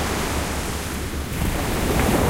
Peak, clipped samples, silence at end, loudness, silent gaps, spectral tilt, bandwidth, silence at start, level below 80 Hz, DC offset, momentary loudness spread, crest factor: -4 dBFS; under 0.1%; 0 s; -24 LUFS; none; -4.5 dB/octave; 16.5 kHz; 0 s; -28 dBFS; under 0.1%; 7 LU; 18 dB